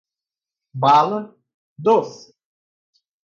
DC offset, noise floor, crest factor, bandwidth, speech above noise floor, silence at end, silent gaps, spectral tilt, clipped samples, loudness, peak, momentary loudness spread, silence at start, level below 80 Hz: under 0.1%; -90 dBFS; 18 dB; 7.4 kHz; 72 dB; 1.05 s; 1.54-1.76 s; -6.5 dB/octave; under 0.1%; -18 LUFS; -4 dBFS; 21 LU; 0.75 s; -74 dBFS